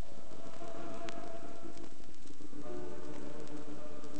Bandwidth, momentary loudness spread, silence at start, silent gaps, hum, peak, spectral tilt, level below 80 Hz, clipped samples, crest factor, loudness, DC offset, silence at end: 8.8 kHz; 8 LU; 0 s; none; none; -18 dBFS; -5.5 dB/octave; -64 dBFS; under 0.1%; 26 dB; -48 LUFS; 4%; 0 s